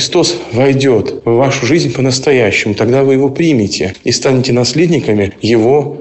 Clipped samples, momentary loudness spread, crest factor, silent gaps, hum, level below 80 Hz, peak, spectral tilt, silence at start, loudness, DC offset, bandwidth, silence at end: under 0.1%; 4 LU; 10 dB; none; none; -44 dBFS; -2 dBFS; -5 dB/octave; 0 s; -11 LUFS; 0.3%; 8.4 kHz; 0 s